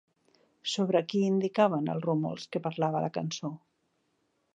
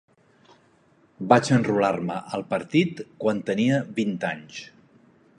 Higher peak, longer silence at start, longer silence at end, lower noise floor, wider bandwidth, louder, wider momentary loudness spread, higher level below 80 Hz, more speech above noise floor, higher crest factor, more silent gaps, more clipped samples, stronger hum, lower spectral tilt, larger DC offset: second, -10 dBFS vs -2 dBFS; second, 0.65 s vs 1.2 s; first, 1 s vs 0.75 s; first, -75 dBFS vs -60 dBFS; second, 9 kHz vs 11 kHz; second, -30 LUFS vs -24 LUFS; second, 10 LU vs 13 LU; second, -78 dBFS vs -66 dBFS; first, 46 dB vs 37 dB; about the same, 20 dB vs 24 dB; neither; neither; neither; about the same, -6 dB/octave vs -6 dB/octave; neither